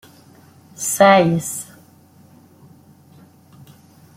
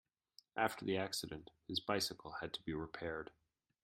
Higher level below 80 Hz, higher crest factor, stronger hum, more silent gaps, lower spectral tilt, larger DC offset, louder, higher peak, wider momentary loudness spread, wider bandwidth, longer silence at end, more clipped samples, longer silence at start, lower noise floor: first, -62 dBFS vs -70 dBFS; about the same, 20 dB vs 24 dB; neither; neither; about the same, -4.5 dB/octave vs -3.5 dB/octave; neither; first, -16 LUFS vs -42 LUFS; first, -2 dBFS vs -20 dBFS; first, 18 LU vs 11 LU; about the same, 16.5 kHz vs 16 kHz; first, 2.55 s vs 0.55 s; neither; first, 0.8 s vs 0.55 s; second, -49 dBFS vs -70 dBFS